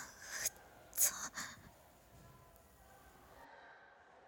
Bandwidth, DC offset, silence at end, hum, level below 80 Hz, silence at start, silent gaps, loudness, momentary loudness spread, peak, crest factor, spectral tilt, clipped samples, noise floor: 17.5 kHz; under 0.1%; 0 s; none; -72 dBFS; 0 s; none; -38 LUFS; 28 LU; -18 dBFS; 28 dB; 0.5 dB/octave; under 0.1%; -63 dBFS